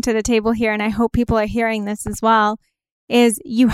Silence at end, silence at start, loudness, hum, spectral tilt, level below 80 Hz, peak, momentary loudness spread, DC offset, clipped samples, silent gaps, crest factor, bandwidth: 0 s; 0.05 s; -18 LUFS; none; -4.5 dB/octave; -36 dBFS; -4 dBFS; 5 LU; under 0.1%; under 0.1%; 2.91-3.08 s; 14 dB; 15 kHz